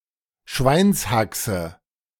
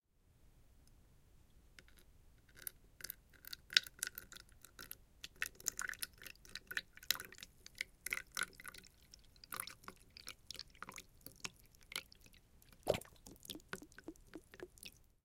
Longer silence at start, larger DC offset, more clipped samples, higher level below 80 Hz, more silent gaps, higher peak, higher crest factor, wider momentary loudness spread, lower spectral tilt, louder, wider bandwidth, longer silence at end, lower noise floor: first, 0.5 s vs 0.3 s; neither; neither; first, -40 dBFS vs -68 dBFS; neither; first, -4 dBFS vs -10 dBFS; second, 18 dB vs 38 dB; second, 12 LU vs 20 LU; first, -5 dB/octave vs -1 dB/octave; first, -21 LUFS vs -45 LUFS; about the same, 18 kHz vs 16.5 kHz; first, 0.45 s vs 0.2 s; second, -52 dBFS vs -69 dBFS